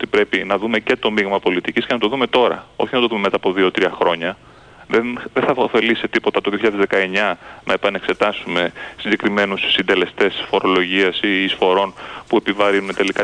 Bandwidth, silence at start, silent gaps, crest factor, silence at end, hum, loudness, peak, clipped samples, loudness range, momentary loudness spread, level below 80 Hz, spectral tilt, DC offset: 10 kHz; 0 s; none; 16 dB; 0 s; none; -18 LUFS; -2 dBFS; under 0.1%; 2 LU; 5 LU; -54 dBFS; -5 dB/octave; under 0.1%